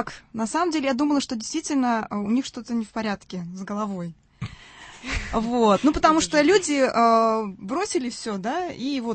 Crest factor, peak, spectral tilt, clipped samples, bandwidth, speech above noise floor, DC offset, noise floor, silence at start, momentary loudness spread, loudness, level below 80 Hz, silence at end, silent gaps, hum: 20 dB; -4 dBFS; -4.5 dB/octave; under 0.1%; 8.8 kHz; 22 dB; under 0.1%; -45 dBFS; 0 s; 16 LU; -23 LUFS; -46 dBFS; 0 s; none; none